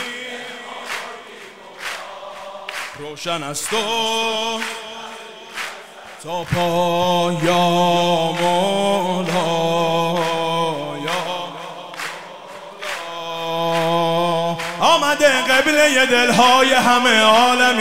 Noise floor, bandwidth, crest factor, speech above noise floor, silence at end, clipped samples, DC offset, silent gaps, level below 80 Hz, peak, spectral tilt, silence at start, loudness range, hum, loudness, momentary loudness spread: -38 dBFS; 16 kHz; 18 dB; 22 dB; 0 s; under 0.1%; 0.9%; none; -56 dBFS; 0 dBFS; -3.5 dB/octave; 0 s; 11 LU; none; -17 LUFS; 19 LU